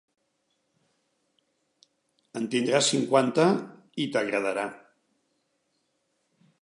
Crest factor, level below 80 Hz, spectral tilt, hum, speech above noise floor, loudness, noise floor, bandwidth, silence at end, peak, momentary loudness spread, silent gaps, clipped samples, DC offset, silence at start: 22 dB; -80 dBFS; -4 dB/octave; none; 50 dB; -26 LUFS; -75 dBFS; 11.5 kHz; 1.85 s; -8 dBFS; 13 LU; none; under 0.1%; under 0.1%; 2.35 s